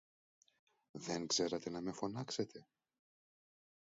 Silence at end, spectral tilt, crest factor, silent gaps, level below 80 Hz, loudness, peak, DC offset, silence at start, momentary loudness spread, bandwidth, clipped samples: 1.35 s; -4 dB/octave; 20 dB; none; -78 dBFS; -41 LUFS; -24 dBFS; under 0.1%; 0.95 s; 14 LU; 7.6 kHz; under 0.1%